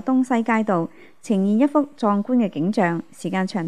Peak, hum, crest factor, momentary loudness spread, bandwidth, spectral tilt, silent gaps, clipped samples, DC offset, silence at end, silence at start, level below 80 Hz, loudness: -6 dBFS; none; 14 dB; 7 LU; 11 kHz; -7 dB/octave; none; under 0.1%; 0.4%; 0 s; 0.05 s; -72 dBFS; -21 LUFS